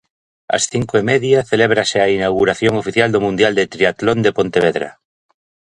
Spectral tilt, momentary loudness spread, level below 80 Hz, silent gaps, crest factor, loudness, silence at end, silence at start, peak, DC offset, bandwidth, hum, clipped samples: -4.5 dB/octave; 4 LU; -48 dBFS; none; 16 dB; -15 LUFS; 0.85 s; 0.5 s; 0 dBFS; under 0.1%; 11.5 kHz; none; under 0.1%